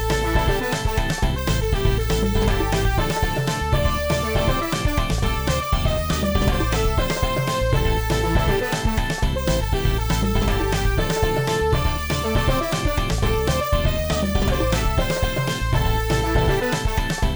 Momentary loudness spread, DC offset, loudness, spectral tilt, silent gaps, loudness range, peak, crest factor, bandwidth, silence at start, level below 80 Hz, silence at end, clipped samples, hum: 2 LU; under 0.1%; -22 LUFS; -5 dB/octave; none; 0 LU; -4 dBFS; 16 dB; over 20 kHz; 0 s; -24 dBFS; 0 s; under 0.1%; none